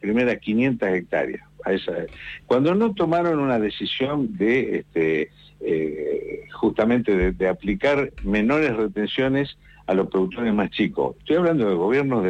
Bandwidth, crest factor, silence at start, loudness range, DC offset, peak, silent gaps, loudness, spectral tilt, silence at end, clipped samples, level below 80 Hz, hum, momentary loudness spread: 8.8 kHz; 14 dB; 0.05 s; 2 LU; under 0.1%; -8 dBFS; none; -22 LUFS; -7.5 dB/octave; 0 s; under 0.1%; -44 dBFS; none; 8 LU